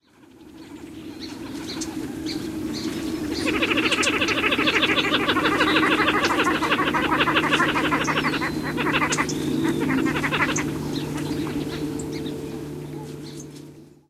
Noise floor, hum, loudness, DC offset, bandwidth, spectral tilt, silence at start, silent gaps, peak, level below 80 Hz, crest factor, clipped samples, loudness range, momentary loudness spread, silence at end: -49 dBFS; none; -22 LUFS; under 0.1%; 15.5 kHz; -4 dB/octave; 0.4 s; none; -4 dBFS; -48 dBFS; 20 dB; under 0.1%; 10 LU; 16 LU; 0.2 s